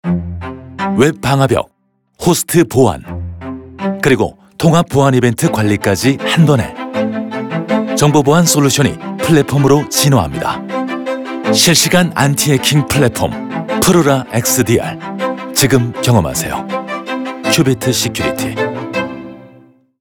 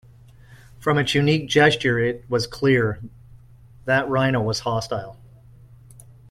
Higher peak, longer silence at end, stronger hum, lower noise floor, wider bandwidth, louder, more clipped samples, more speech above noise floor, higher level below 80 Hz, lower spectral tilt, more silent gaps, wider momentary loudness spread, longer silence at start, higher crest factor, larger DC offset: first, 0 dBFS vs -4 dBFS; second, 0.55 s vs 1.15 s; neither; about the same, -45 dBFS vs -48 dBFS; first, over 20 kHz vs 14.5 kHz; first, -13 LUFS vs -21 LUFS; neither; first, 33 dB vs 27 dB; first, -42 dBFS vs -50 dBFS; about the same, -4.5 dB/octave vs -5.5 dB/octave; neither; second, 11 LU vs 14 LU; second, 0.05 s vs 0.5 s; about the same, 14 dB vs 18 dB; neither